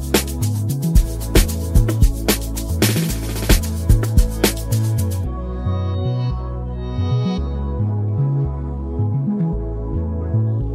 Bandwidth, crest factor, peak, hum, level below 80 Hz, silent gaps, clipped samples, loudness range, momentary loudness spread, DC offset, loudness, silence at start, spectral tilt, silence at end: 16 kHz; 16 dB; -2 dBFS; none; -22 dBFS; none; under 0.1%; 4 LU; 7 LU; under 0.1%; -20 LUFS; 0 s; -5.5 dB/octave; 0 s